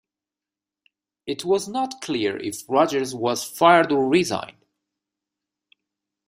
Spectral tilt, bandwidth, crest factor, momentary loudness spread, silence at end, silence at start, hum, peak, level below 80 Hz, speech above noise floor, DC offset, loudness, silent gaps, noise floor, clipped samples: -4 dB/octave; 16 kHz; 22 dB; 14 LU; 1.75 s; 1.25 s; none; -2 dBFS; -66 dBFS; 68 dB; under 0.1%; -22 LUFS; none; -89 dBFS; under 0.1%